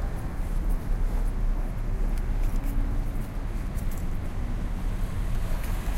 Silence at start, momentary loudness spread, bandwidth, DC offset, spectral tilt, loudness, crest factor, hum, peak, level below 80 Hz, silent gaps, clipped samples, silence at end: 0 s; 3 LU; 14.5 kHz; under 0.1%; -6.5 dB/octave; -33 LUFS; 10 dB; none; -16 dBFS; -26 dBFS; none; under 0.1%; 0 s